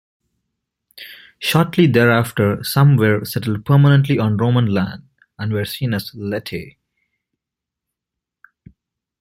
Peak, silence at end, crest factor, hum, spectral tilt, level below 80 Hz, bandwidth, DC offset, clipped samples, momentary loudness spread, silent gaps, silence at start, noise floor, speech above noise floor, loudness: -2 dBFS; 2.5 s; 16 dB; none; -6.5 dB/octave; -54 dBFS; 16 kHz; under 0.1%; under 0.1%; 17 LU; none; 0.95 s; -84 dBFS; 68 dB; -17 LUFS